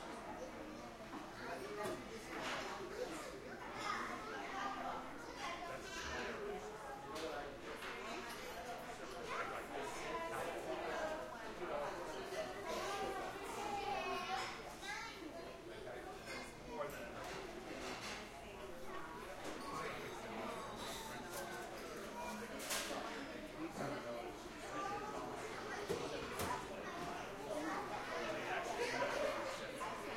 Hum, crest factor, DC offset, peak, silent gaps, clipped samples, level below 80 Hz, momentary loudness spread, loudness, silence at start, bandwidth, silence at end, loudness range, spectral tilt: none; 18 dB; under 0.1%; -28 dBFS; none; under 0.1%; -64 dBFS; 8 LU; -46 LUFS; 0 s; 16 kHz; 0 s; 4 LU; -3.5 dB/octave